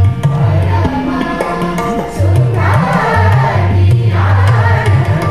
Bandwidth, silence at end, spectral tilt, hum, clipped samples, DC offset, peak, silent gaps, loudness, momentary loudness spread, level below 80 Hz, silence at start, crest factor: 11.5 kHz; 0 s; -7.5 dB/octave; none; under 0.1%; 1%; 0 dBFS; none; -12 LUFS; 6 LU; -30 dBFS; 0 s; 10 dB